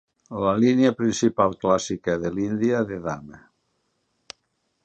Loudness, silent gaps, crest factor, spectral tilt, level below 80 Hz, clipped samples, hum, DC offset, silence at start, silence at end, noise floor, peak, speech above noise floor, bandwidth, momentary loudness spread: -23 LUFS; none; 18 dB; -5.5 dB/octave; -56 dBFS; under 0.1%; none; under 0.1%; 0.3 s; 1.55 s; -73 dBFS; -6 dBFS; 51 dB; 8.6 kHz; 11 LU